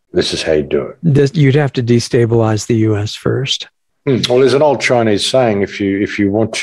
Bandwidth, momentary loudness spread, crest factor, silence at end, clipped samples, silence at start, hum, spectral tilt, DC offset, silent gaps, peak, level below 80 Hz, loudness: 12 kHz; 7 LU; 12 dB; 0 s; under 0.1%; 0.15 s; none; -5.5 dB/octave; under 0.1%; none; 0 dBFS; -46 dBFS; -14 LUFS